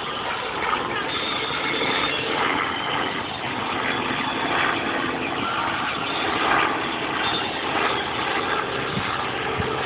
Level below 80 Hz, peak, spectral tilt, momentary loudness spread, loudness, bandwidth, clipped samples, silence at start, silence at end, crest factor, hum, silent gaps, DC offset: -50 dBFS; -6 dBFS; -1.5 dB/octave; 4 LU; -23 LUFS; 4 kHz; under 0.1%; 0 s; 0 s; 18 dB; none; none; under 0.1%